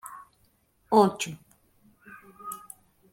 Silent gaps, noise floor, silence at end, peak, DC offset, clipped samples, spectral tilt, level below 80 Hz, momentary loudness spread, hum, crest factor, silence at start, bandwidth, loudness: none; -67 dBFS; 0.55 s; -6 dBFS; under 0.1%; under 0.1%; -5 dB/octave; -70 dBFS; 27 LU; none; 24 dB; 0.05 s; 16.5 kHz; -25 LUFS